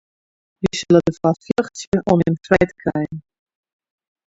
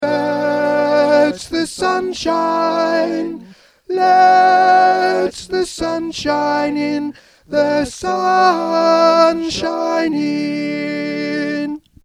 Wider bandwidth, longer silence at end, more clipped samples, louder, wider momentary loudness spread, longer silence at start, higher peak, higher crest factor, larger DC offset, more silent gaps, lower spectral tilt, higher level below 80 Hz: second, 8 kHz vs 13.5 kHz; first, 1.1 s vs 0.25 s; neither; second, -19 LUFS vs -15 LUFS; about the same, 10 LU vs 10 LU; first, 0.6 s vs 0 s; about the same, 0 dBFS vs 0 dBFS; about the same, 20 dB vs 16 dB; neither; first, 1.87-1.92 s vs none; first, -6.5 dB/octave vs -4.5 dB/octave; about the same, -46 dBFS vs -50 dBFS